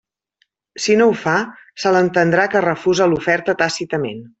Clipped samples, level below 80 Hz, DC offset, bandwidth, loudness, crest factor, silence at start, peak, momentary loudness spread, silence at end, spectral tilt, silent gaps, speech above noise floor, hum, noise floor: under 0.1%; -56 dBFS; under 0.1%; 8.2 kHz; -17 LUFS; 16 dB; 0.75 s; -2 dBFS; 9 LU; 0.15 s; -5 dB/octave; none; 49 dB; none; -66 dBFS